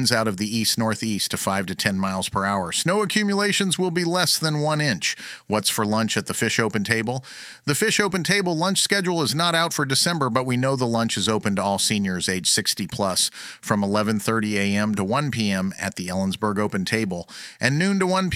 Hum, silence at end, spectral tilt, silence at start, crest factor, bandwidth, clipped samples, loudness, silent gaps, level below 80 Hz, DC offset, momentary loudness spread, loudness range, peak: none; 0 s; -3.5 dB/octave; 0 s; 22 dB; 16.5 kHz; under 0.1%; -22 LUFS; none; -58 dBFS; under 0.1%; 5 LU; 3 LU; -2 dBFS